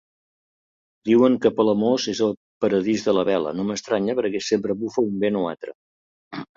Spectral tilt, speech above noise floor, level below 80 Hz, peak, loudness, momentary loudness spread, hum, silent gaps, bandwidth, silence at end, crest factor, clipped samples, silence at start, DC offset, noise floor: -5.5 dB/octave; over 69 dB; -62 dBFS; -4 dBFS; -22 LUFS; 11 LU; none; 2.37-2.61 s, 5.75-6.31 s; 7.8 kHz; 0.1 s; 18 dB; under 0.1%; 1.05 s; under 0.1%; under -90 dBFS